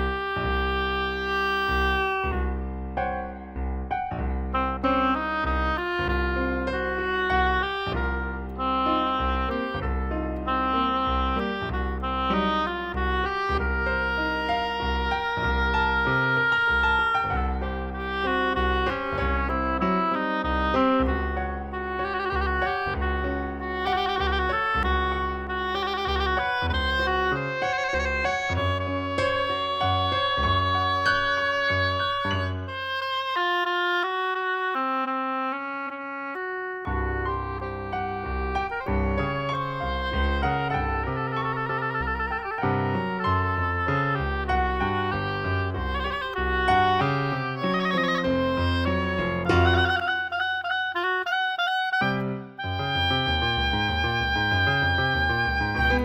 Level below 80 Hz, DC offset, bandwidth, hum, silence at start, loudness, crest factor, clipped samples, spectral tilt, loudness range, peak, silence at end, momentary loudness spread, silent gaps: -34 dBFS; under 0.1%; 15 kHz; none; 0 s; -25 LUFS; 18 dB; under 0.1%; -6.5 dB/octave; 4 LU; -8 dBFS; 0 s; 7 LU; none